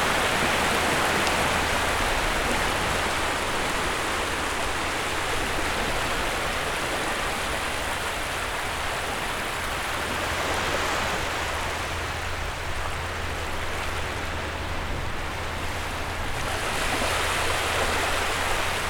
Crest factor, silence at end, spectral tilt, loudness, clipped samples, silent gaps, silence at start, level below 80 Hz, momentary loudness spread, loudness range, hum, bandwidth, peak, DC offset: 22 dB; 0 s; -3 dB/octave; -26 LUFS; under 0.1%; none; 0 s; -36 dBFS; 8 LU; 6 LU; none; over 20 kHz; -4 dBFS; under 0.1%